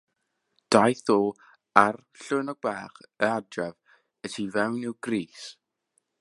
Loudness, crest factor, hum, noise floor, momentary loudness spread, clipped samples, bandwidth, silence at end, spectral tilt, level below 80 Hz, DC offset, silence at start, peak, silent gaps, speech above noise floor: -26 LUFS; 28 dB; none; -78 dBFS; 18 LU; under 0.1%; 11.5 kHz; 0.7 s; -5 dB/octave; -70 dBFS; under 0.1%; 0.7 s; 0 dBFS; none; 52 dB